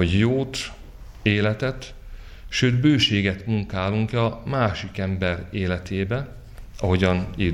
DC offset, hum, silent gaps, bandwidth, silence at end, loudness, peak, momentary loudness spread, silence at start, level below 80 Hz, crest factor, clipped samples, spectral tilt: under 0.1%; none; none; 12 kHz; 0 s; -23 LUFS; -6 dBFS; 11 LU; 0 s; -40 dBFS; 18 dB; under 0.1%; -6 dB/octave